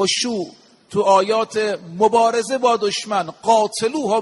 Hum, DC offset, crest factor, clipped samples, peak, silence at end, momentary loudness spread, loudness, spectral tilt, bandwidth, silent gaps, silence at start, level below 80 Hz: none; under 0.1%; 16 dB; under 0.1%; -2 dBFS; 0 s; 8 LU; -18 LUFS; -3 dB/octave; 11.5 kHz; none; 0 s; -64 dBFS